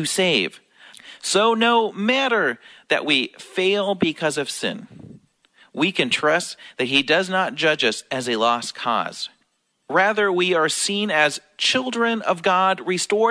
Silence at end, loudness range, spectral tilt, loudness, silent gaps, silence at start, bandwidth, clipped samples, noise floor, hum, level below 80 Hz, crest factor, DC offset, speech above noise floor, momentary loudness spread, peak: 0 s; 3 LU; -3 dB/octave; -20 LUFS; none; 0 s; 11 kHz; under 0.1%; -68 dBFS; none; -70 dBFS; 18 dB; under 0.1%; 48 dB; 9 LU; -4 dBFS